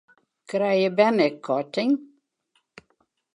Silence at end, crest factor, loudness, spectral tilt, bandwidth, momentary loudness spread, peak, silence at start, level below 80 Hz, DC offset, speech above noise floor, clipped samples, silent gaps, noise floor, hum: 1.3 s; 20 dB; -23 LUFS; -6.5 dB/octave; 10.5 kHz; 8 LU; -6 dBFS; 0.5 s; -80 dBFS; under 0.1%; 49 dB; under 0.1%; none; -71 dBFS; none